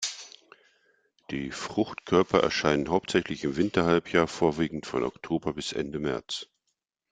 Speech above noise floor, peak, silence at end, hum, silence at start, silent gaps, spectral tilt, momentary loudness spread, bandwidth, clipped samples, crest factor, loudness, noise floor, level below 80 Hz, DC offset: 53 dB; -6 dBFS; 0.65 s; none; 0 s; none; -5 dB/octave; 12 LU; 9.4 kHz; under 0.1%; 22 dB; -28 LUFS; -80 dBFS; -56 dBFS; under 0.1%